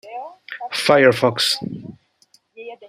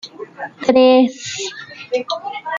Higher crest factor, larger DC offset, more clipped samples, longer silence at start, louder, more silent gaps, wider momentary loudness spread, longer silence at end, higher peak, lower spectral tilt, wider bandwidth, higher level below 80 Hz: about the same, 20 dB vs 16 dB; neither; neither; about the same, 0.05 s vs 0.05 s; about the same, -17 LUFS vs -16 LUFS; neither; about the same, 22 LU vs 20 LU; about the same, 0 s vs 0 s; about the same, 0 dBFS vs -2 dBFS; about the same, -4 dB/octave vs -3.5 dB/octave; first, 15.5 kHz vs 7.6 kHz; about the same, -64 dBFS vs -62 dBFS